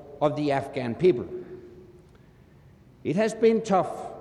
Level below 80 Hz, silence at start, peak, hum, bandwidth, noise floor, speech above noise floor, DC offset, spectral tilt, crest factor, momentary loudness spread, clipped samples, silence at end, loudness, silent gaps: -60 dBFS; 0 s; -10 dBFS; none; 11.5 kHz; -54 dBFS; 30 dB; under 0.1%; -6.5 dB/octave; 18 dB; 16 LU; under 0.1%; 0 s; -25 LUFS; none